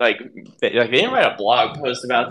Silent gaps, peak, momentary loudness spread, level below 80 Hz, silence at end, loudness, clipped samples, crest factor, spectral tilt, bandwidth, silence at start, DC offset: none; 0 dBFS; 8 LU; -66 dBFS; 0 s; -18 LUFS; under 0.1%; 18 dB; -4 dB/octave; 11.5 kHz; 0 s; under 0.1%